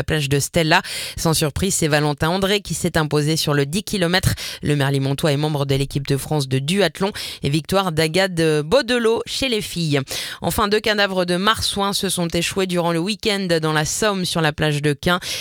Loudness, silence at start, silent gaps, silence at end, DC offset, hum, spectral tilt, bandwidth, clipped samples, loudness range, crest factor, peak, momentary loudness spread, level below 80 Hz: -19 LUFS; 0 s; none; 0 s; under 0.1%; none; -4.5 dB/octave; 18.5 kHz; under 0.1%; 1 LU; 18 dB; -2 dBFS; 4 LU; -40 dBFS